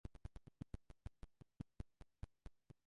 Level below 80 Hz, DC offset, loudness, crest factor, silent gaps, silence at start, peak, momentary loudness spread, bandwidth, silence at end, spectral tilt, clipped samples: -60 dBFS; under 0.1%; -60 LUFS; 22 dB; none; 0.05 s; -34 dBFS; 9 LU; 11 kHz; 0.3 s; -7.5 dB/octave; under 0.1%